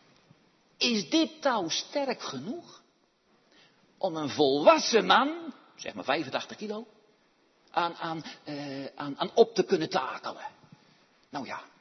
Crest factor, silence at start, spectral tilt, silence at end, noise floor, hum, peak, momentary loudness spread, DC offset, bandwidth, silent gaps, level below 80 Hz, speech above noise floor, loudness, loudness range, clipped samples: 24 dB; 0.8 s; -3.5 dB/octave; 0.15 s; -68 dBFS; none; -6 dBFS; 18 LU; under 0.1%; 6.4 kHz; none; -80 dBFS; 40 dB; -28 LUFS; 8 LU; under 0.1%